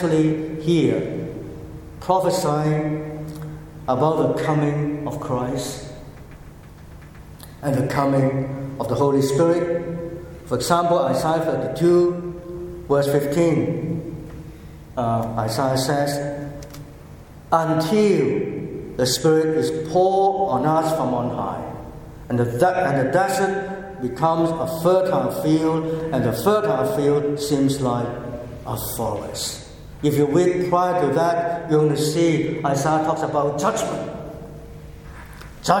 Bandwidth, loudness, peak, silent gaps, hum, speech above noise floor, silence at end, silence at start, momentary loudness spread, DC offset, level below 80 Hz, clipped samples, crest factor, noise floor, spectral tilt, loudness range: 17.5 kHz; -21 LUFS; 0 dBFS; none; none; 21 dB; 0 s; 0 s; 17 LU; under 0.1%; -46 dBFS; under 0.1%; 22 dB; -41 dBFS; -6 dB/octave; 4 LU